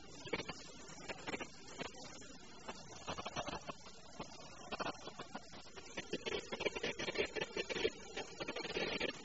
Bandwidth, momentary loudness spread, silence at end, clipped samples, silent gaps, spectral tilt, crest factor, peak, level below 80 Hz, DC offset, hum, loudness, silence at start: 8 kHz; 13 LU; 0 s; under 0.1%; none; -2 dB/octave; 24 dB; -22 dBFS; -66 dBFS; 0.1%; none; -44 LUFS; 0 s